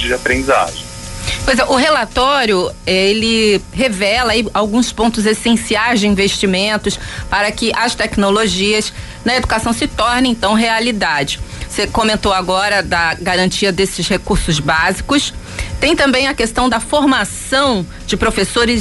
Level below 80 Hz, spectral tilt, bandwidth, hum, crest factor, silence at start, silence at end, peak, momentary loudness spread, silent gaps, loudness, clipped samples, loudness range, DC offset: -30 dBFS; -3.5 dB/octave; 12 kHz; none; 12 dB; 0 s; 0 s; -2 dBFS; 6 LU; none; -14 LUFS; under 0.1%; 2 LU; under 0.1%